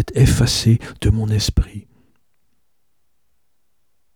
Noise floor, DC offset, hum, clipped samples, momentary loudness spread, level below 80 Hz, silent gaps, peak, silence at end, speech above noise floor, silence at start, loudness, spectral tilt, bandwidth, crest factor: -73 dBFS; 0.1%; none; under 0.1%; 11 LU; -28 dBFS; none; -2 dBFS; 2.35 s; 57 dB; 0 s; -17 LUFS; -5.5 dB/octave; 17.5 kHz; 18 dB